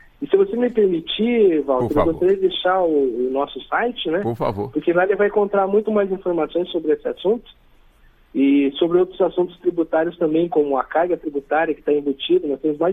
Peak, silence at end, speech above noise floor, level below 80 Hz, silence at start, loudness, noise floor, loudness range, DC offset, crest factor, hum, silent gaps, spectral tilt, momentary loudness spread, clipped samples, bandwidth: -4 dBFS; 0 s; 33 dB; -48 dBFS; 0.2 s; -20 LUFS; -52 dBFS; 2 LU; under 0.1%; 16 dB; none; none; -8 dB/octave; 5 LU; under 0.1%; 4.4 kHz